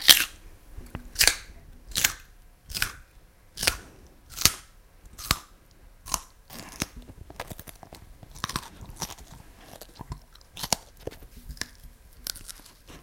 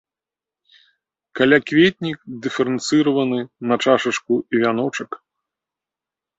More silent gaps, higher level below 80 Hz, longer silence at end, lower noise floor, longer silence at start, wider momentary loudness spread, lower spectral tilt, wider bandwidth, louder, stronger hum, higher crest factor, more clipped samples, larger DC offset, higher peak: neither; first, -46 dBFS vs -62 dBFS; second, 0.05 s vs 1.2 s; second, -54 dBFS vs -89 dBFS; second, 0 s vs 1.35 s; first, 26 LU vs 12 LU; second, -0.5 dB/octave vs -5 dB/octave; first, 17 kHz vs 8.2 kHz; second, -27 LUFS vs -19 LUFS; neither; first, 32 dB vs 18 dB; neither; neither; about the same, 0 dBFS vs -2 dBFS